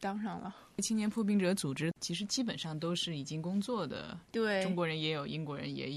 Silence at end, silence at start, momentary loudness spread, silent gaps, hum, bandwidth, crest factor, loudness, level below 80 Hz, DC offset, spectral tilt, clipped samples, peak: 0 s; 0 s; 8 LU; none; none; 13.5 kHz; 16 dB; -35 LUFS; -70 dBFS; under 0.1%; -4.5 dB/octave; under 0.1%; -20 dBFS